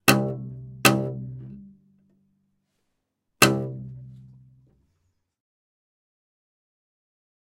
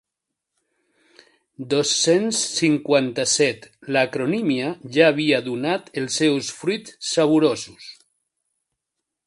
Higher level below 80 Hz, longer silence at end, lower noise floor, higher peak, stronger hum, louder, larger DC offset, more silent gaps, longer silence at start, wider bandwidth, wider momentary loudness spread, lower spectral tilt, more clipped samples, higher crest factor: first, -60 dBFS vs -68 dBFS; first, 3.2 s vs 1.35 s; second, -78 dBFS vs -83 dBFS; about the same, 0 dBFS vs 0 dBFS; neither; about the same, -22 LUFS vs -20 LUFS; neither; neither; second, 0.05 s vs 1.6 s; first, 16 kHz vs 11.5 kHz; first, 21 LU vs 9 LU; about the same, -4 dB/octave vs -3.5 dB/octave; neither; first, 28 dB vs 22 dB